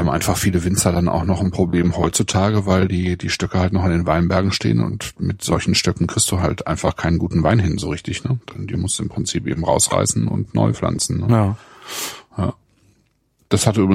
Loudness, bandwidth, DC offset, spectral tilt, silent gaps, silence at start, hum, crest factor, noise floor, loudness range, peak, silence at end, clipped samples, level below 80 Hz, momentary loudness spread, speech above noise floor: -19 LUFS; 16 kHz; under 0.1%; -5 dB/octave; none; 0 s; none; 16 dB; -62 dBFS; 3 LU; -2 dBFS; 0 s; under 0.1%; -38 dBFS; 8 LU; 44 dB